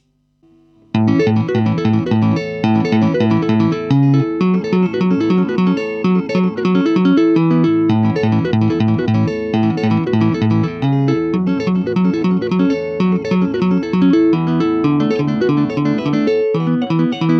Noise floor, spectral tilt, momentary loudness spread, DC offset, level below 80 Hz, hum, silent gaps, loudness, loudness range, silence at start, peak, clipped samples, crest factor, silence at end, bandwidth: -56 dBFS; -8.5 dB/octave; 4 LU; under 0.1%; -52 dBFS; none; none; -15 LUFS; 2 LU; 0.95 s; -2 dBFS; under 0.1%; 12 dB; 0 s; 6.6 kHz